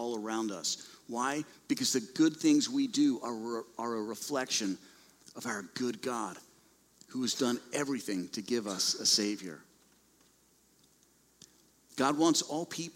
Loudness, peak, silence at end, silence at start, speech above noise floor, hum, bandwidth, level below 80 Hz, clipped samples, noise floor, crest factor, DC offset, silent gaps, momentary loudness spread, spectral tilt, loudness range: -32 LUFS; -14 dBFS; 0.05 s; 0 s; 35 dB; none; 16 kHz; -78 dBFS; under 0.1%; -67 dBFS; 20 dB; under 0.1%; none; 14 LU; -2.5 dB/octave; 6 LU